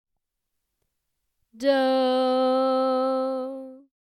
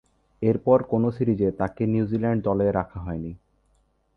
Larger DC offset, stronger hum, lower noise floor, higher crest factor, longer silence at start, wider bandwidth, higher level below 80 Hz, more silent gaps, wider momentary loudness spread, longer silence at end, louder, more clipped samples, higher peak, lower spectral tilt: neither; neither; first, -80 dBFS vs -66 dBFS; about the same, 16 dB vs 20 dB; first, 1.55 s vs 0.4 s; first, 11 kHz vs 4.8 kHz; second, -78 dBFS vs -48 dBFS; neither; about the same, 10 LU vs 12 LU; second, 0.25 s vs 0.8 s; about the same, -23 LUFS vs -24 LUFS; neither; second, -10 dBFS vs -6 dBFS; second, -4 dB/octave vs -11.5 dB/octave